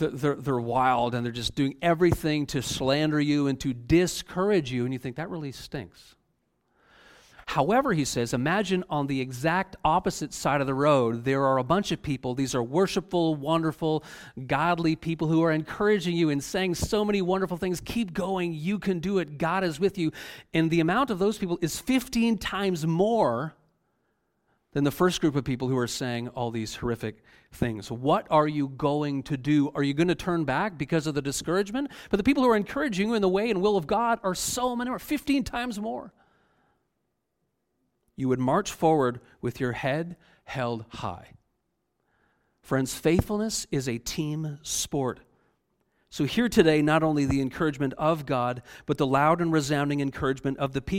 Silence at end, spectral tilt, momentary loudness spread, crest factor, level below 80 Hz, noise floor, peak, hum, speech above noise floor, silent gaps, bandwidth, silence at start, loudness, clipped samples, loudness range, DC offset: 0 s; -5.5 dB/octave; 8 LU; 20 dB; -50 dBFS; -78 dBFS; -6 dBFS; none; 52 dB; none; 16.5 kHz; 0 s; -26 LUFS; under 0.1%; 5 LU; under 0.1%